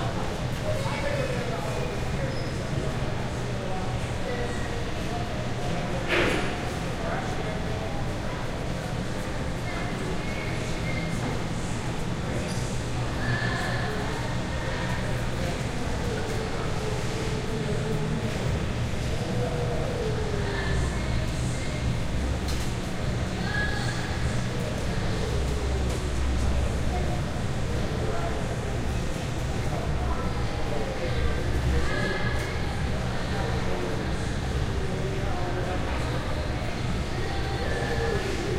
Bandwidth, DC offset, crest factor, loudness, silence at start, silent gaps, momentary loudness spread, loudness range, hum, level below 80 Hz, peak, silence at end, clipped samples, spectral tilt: 15.5 kHz; under 0.1%; 16 dB; -29 LUFS; 0 s; none; 4 LU; 2 LU; none; -34 dBFS; -10 dBFS; 0 s; under 0.1%; -5.5 dB/octave